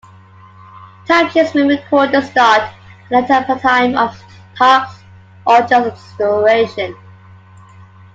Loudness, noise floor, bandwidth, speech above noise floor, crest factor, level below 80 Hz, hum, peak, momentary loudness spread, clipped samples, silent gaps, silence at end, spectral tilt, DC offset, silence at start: -13 LUFS; -41 dBFS; 7.8 kHz; 28 dB; 14 dB; -58 dBFS; none; 0 dBFS; 12 LU; under 0.1%; none; 1.2 s; -5 dB/octave; under 0.1%; 0.75 s